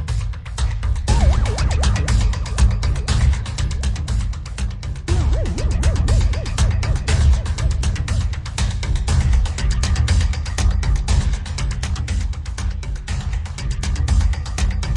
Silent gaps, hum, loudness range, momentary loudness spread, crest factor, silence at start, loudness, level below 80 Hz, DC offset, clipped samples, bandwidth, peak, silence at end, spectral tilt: none; none; 4 LU; 8 LU; 14 dB; 0 s; -21 LUFS; -20 dBFS; under 0.1%; under 0.1%; 11.5 kHz; -4 dBFS; 0 s; -5 dB/octave